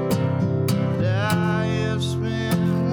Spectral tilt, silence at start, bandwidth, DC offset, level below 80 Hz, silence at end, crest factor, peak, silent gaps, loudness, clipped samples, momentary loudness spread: -6.5 dB/octave; 0 s; over 20 kHz; under 0.1%; -50 dBFS; 0 s; 10 dB; -12 dBFS; none; -22 LUFS; under 0.1%; 3 LU